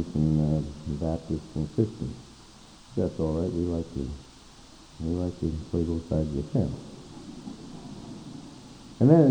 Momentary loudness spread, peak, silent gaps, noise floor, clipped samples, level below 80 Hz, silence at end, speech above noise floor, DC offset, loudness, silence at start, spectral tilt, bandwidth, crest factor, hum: 22 LU; -6 dBFS; none; -50 dBFS; under 0.1%; -44 dBFS; 0 s; 24 dB; under 0.1%; -28 LUFS; 0 s; -8.5 dB/octave; 9.8 kHz; 22 dB; none